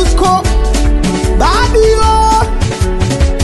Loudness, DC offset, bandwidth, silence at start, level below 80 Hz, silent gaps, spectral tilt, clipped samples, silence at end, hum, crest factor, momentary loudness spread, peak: -11 LUFS; under 0.1%; 12 kHz; 0 s; -12 dBFS; none; -5 dB/octave; under 0.1%; 0 s; none; 10 dB; 5 LU; 0 dBFS